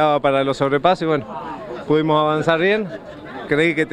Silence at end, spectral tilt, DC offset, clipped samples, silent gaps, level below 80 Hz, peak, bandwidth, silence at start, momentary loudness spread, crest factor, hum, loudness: 0 s; -6.5 dB/octave; under 0.1%; under 0.1%; none; -50 dBFS; 0 dBFS; 10 kHz; 0 s; 14 LU; 18 dB; none; -18 LUFS